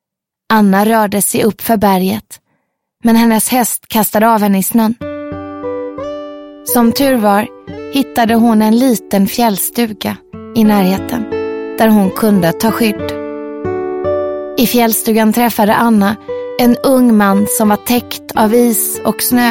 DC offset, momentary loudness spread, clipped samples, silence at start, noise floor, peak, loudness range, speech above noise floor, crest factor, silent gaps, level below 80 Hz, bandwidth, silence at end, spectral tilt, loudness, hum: under 0.1%; 12 LU; under 0.1%; 0.5 s; -74 dBFS; 0 dBFS; 3 LU; 63 dB; 12 dB; none; -46 dBFS; 17 kHz; 0 s; -4.5 dB/octave; -12 LUFS; none